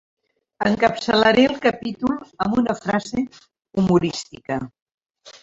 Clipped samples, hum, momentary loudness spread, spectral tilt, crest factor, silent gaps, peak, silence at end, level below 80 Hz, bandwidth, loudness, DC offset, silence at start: under 0.1%; none; 13 LU; -5.5 dB/octave; 20 dB; 4.82-4.86 s, 4.94-4.98 s, 5.10-5.14 s; -2 dBFS; 0.05 s; -52 dBFS; 7.8 kHz; -20 LUFS; under 0.1%; 0.6 s